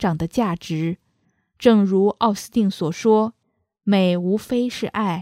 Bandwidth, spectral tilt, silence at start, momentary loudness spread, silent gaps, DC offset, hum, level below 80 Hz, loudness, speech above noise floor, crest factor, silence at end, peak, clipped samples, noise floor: 15 kHz; -6.5 dB/octave; 0 s; 9 LU; none; under 0.1%; none; -54 dBFS; -20 LUFS; 52 dB; 20 dB; 0 s; 0 dBFS; under 0.1%; -72 dBFS